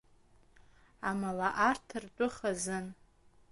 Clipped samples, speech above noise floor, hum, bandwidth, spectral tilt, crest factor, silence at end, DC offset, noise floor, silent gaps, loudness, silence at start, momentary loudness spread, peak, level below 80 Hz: under 0.1%; 30 dB; none; 11.5 kHz; -4.5 dB/octave; 22 dB; 0.6 s; under 0.1%; -64 dBFS; none; -34 LUFS; 0.6 s; 11 LU; -14 dBFS; -64 dBFS